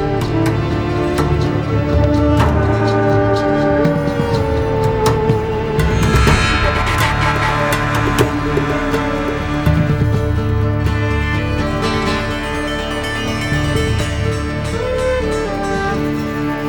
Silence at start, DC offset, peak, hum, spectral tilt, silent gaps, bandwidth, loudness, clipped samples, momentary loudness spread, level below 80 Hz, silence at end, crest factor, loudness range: 0 s; under 0.1%; 0 dBFS; none; -6 dB/octave; none; 18.5 kHz; -16 LUFS; under 0.1%; 5 LU; -24 dBFS; 0 s; 16 dB; 4 LU